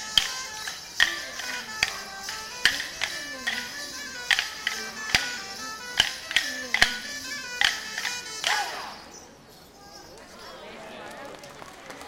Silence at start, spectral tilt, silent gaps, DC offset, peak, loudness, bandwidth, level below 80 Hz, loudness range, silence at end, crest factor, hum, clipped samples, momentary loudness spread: 0 s; 0.5 dB/octave; none; under 0.1%; 0 dBFS; -27 LUFS; 16.5 kHz; -54 dBFS; 8 LU; 0 s; 30 dB; none; under 0.1%; 19 LU